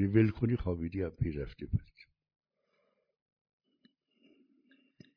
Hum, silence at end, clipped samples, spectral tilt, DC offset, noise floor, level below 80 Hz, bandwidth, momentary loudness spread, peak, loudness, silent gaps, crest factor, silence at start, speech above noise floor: none; 3.35 s; under 0.1%; -11 dB/octave; under 0.1%; -78 dBFS; -52 dBFS; 5.4 kHz; 10 LU; -14 dBFS; -34 LUFS; none; 22 dB; 0 s; 46 dB